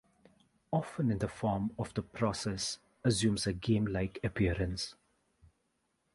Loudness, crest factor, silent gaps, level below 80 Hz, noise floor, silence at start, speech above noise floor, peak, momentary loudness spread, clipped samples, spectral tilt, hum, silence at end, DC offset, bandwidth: -34 LUFS; 18 dB; none; -52 dBFS; -79 dBFS; 0.7 s; 46 dB; -16 dBFS; 7 LU; under 0.1%; -5.5 dB/octave; none; 1.2 s; under 0.1%; 11.5 kHz